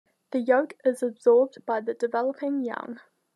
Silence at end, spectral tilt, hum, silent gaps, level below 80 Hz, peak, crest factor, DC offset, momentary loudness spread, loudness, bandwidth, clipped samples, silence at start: 0.4 s; -5.5 dB/octave; none; none; under -90 dBFS; -8 dBFS; 18 dB; under 0.1%; 12 LU; -25 LUFS; 12 kHz; under 0.1%; 0.35 s